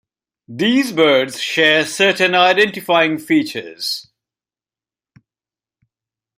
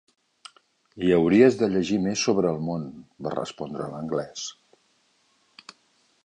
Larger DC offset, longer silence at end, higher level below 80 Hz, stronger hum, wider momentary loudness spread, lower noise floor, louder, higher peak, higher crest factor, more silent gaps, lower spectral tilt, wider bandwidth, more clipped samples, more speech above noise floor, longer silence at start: neither; first, 2.35 s vs 1.75 s; second, -66 dBFS vs -58 dBFS; neither; second, 11 LU vs 17 LU; first, under -90 dBFS vs -66 dBFS; first, -15 LUFS vs -24 LUFS; first, 0 dBFS vs -6 dBFS; about the same, 18 dB vs 20 dB; neither; second, -3.5 dB/octave vs -5.5 dB/octave; first, 16 kHz vs 10 kHz; neither; first, over 74 dB vs 43 dB; second, 0.5 s vs 0.95 s